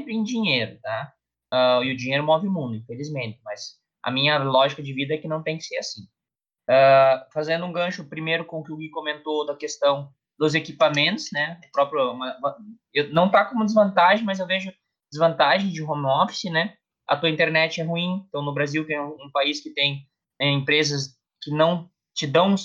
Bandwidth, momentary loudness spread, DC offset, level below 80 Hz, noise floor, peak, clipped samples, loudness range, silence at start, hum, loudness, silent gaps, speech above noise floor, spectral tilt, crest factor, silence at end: 7.6 kHz; 13 LU; under 0.1%; -72 dBFS; -89 dBFS; -6 dBFS; under 0.1%; 4 LU; 0 s; none; -22 LUFS; none; 67 dB; -5 dB/octave; 18 dB; 0 s